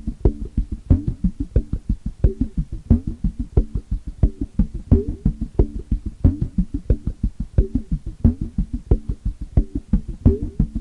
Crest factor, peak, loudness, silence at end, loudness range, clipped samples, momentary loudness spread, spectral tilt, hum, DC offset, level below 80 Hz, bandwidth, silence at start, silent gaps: 18 dB; -2 dBFS; -23 LUFS; 0 s; 1 LU; under 0.1%; 8 LU; -11 dB/octave; none; under 0.1%; -24 dBFS; 2.7 kHz; 0.05 s; none